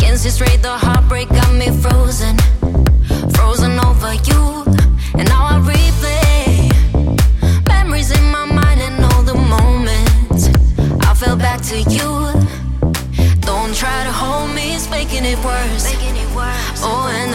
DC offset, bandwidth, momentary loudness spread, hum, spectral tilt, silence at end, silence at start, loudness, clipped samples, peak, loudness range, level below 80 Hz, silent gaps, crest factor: under 0.1%; 16.5 kHz; 6 LU; none; -5.5 dB/octave; 0 s; 0 s; -14 LUFS; under 0.1%; -2 dBFS; 4 LU; -14 dBFS; none; 8 dB